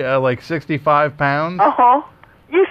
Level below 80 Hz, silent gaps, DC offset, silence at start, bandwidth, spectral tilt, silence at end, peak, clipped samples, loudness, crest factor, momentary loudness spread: -54 dBFS; none; under 0.1%; 0 s; 7.6 kHz; -8 dB/octave; 0 s; -4 dBFS; under 0.1%; -16 LUFS; 12 dB; 7 LU